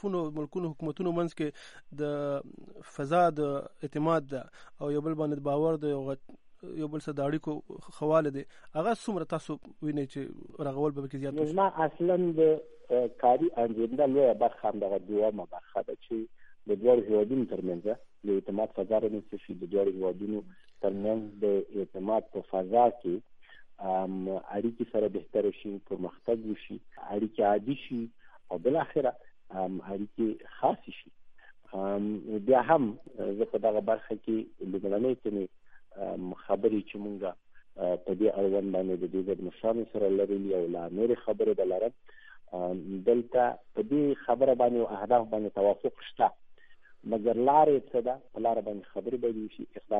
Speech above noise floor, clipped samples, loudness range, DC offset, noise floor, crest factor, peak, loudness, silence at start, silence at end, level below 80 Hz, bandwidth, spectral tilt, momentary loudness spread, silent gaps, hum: 22 dB; under 0.1%; 5 LU; under 0.1%; -52 dBFS; 20 dB; -10 dBFS; -30 LUFS; 0.05 s; 0 s; -66 dBFS; 10.5 kHz; -8 dB/octave; 13 LU; none; none